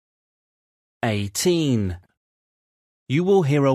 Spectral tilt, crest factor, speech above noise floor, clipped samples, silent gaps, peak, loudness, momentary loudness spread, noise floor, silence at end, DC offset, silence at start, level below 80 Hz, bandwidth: -5.5 dB/octave; 16 dB; over 70 dB; under 0.1%; 2.17-3.06 s; -8 dBFS; -21 LUFS; 10 LU; under -90 dBFS; 0 s; under 0.1%; 1.05 s; -54 dBFS; 14 kHz